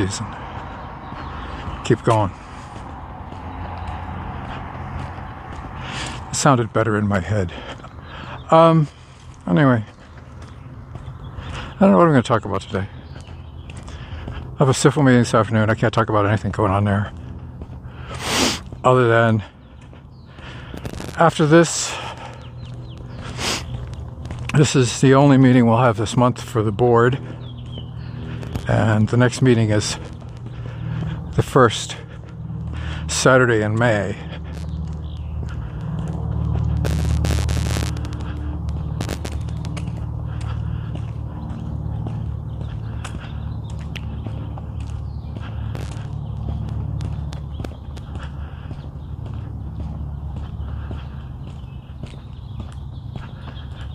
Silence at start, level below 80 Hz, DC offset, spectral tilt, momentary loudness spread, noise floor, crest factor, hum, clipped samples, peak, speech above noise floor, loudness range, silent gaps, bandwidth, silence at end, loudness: 0 s; -34 dBFS; under 0.1%; -6 dB/octave; 20 LU; -41 dBFS; 20 dB; none; under 0.1%; 0 dBFS; 25 dB; 13 LU; none; 15.5 kHz; 0 s; -20 LUFS